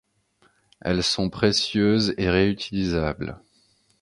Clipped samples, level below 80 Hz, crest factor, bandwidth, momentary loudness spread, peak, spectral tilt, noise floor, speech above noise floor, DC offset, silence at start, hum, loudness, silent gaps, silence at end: under 0.1%; -42 dBFS; 20 dB; 11.5 kHz; 9 LU; -6 dBFS; -5 dB/octave; -64 dBFS; 41 dB; under 0.1%; 0.85 s; none; -23 LUFS; none; 0.65 s